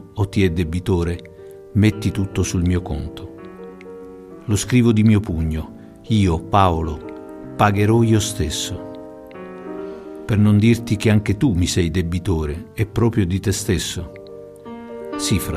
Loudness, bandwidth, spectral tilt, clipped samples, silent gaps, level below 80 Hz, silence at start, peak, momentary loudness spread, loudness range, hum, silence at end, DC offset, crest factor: -19 LUFS; 15 kHz; -6 dB/octave; under 0.1%; none; -36 dBFS; 0 s; -2 dBFS; 21 LU; 4 LU; none; 0 s; under 0.1%; 18 dB